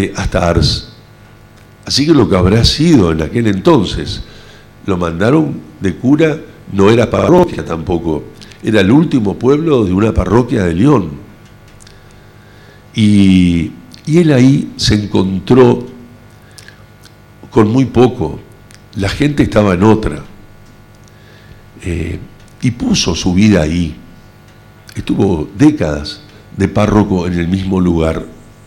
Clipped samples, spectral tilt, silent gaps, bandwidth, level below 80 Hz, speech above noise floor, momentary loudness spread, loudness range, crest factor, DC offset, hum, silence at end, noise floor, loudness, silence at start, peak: under 0.1%; -6.5 dB/octave; none; 14 kHz; -30 dBFS; 29 dB; 14 LU; 4 LU; 12 dB; under 0.1%; 50 Hz at -40 dBFS; 0.3 s; -40 dBFS; -12 LUFS; 0 s; 0 dBFS